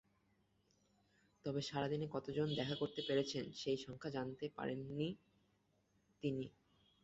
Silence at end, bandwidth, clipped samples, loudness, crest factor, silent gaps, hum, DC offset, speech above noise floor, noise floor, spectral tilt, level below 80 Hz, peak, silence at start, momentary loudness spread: 0.55 s; 8 kHz; under 0.1%; -43 LUFS; 18 dB; none; none; under 0.1%; 37 dB; -79 dBFS; -5 dB/octave; -74 dBFS; -26 dBFS; 1.45 s; 7 LU